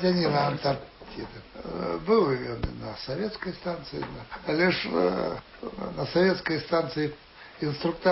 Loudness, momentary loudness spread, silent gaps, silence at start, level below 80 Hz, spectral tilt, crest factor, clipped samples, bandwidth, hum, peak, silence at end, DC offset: -28 LUFS; 16 LU; none; 0 s; -50 dBFS; -9.5 dB/octave; 18 dB; under 0.1%; 5.8 kHz; none; -10 dBFS; 0 s; under 0.1%